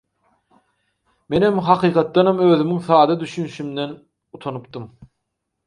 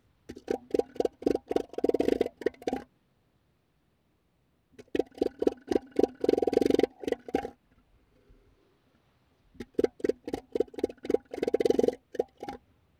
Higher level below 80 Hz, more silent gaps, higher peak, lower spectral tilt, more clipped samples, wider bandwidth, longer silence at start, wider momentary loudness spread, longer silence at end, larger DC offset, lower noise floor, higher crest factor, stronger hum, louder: about the same, -58 dBFS vs -60 dBFS; neither; first, 0 dBFS vs -8 dBFS; first, -7.5 dB/octave vs -6 dB/octave; neither; second, 10.5 kHz vs 15 kHz; first, 1.3 s vs 0.3 s; first, 16 LU vs 11 LU; first, 0.6 s vs 0.45 s; neither; first, -77 dBFS vs -72 dBFS; about the same, 20 dB vs 22 dB; neither; first, -18 LUFS vs -31 LUFS